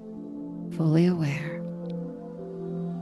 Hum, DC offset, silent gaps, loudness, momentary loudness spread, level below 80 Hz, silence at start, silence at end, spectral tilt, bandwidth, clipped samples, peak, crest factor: none; under 0.1%; none; -29 LUFS; 16 LU; -64 dBFS; 0 s; 0 s; -8.5 dB/octave; 11 kHz; under 0.1%; -10 dBFS; 18 dB